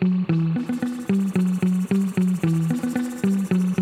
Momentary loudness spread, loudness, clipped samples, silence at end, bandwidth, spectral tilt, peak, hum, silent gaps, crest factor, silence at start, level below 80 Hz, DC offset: 4 LU; -22 LUFS; under 0.1%; 0 s; 14 kHz; -8 dB/octave; -8 dBFS; none; none; 14 dB; 0 s; -62 dBFS; under 0.1%